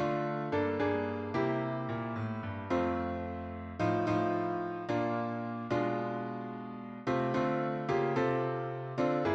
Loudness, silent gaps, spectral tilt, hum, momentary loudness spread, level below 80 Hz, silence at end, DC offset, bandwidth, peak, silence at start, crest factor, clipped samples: -34 LUFS; none; -8 dB/octave; none; 8 LU; -62 dBFS; 0 s; under 0.1%; 8 kHz; -18 dBFS; 0 s; 14 dB; under 0.1%